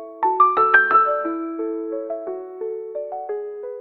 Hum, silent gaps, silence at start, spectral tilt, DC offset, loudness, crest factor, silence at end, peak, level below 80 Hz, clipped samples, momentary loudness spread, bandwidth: none; none; 0 s; -6.5 dB/octave; under 0.1%; -20 LUFS; 20 dB; 0 s; 0 dBFS; -72 dBFS; under 0.1%; 16 LU; 4.4 kHz